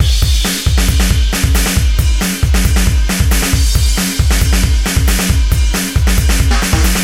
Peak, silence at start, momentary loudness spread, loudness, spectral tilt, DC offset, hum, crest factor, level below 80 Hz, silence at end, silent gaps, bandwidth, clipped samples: 0 dBFS; 0 s; 1 LU; -13 LUFS; -4 dB/octave; under 0.1%; none; 10 dB; -12 dBFS; 0 s; none; 16.5 kHz; under 0.1%